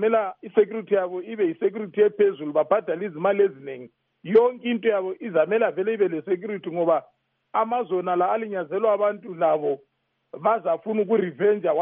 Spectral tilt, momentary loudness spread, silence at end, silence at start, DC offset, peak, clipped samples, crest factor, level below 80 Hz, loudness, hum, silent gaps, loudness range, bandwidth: -5 dB/octave; 7 LU; 0 s; 0 s; under 0.1%; -6 dBFS; under 0.1%; 16 dB; -78 dBFS; -24 LUFS; none; none; 2 LU; 3.7 kHz